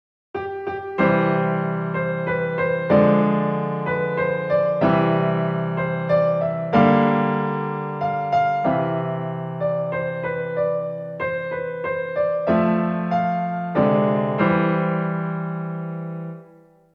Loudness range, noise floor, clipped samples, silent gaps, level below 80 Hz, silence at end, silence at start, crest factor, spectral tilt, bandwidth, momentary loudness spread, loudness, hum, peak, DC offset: 4 LU; -51 dBFS; under 0.1%; none; -60 dBFS; 0.5 s; 0.35 s; 18 dB; -10 dB/octave; 5.4 kHz; 10 LU; -21 LUFS; none; -4 dBFS; under 0.1%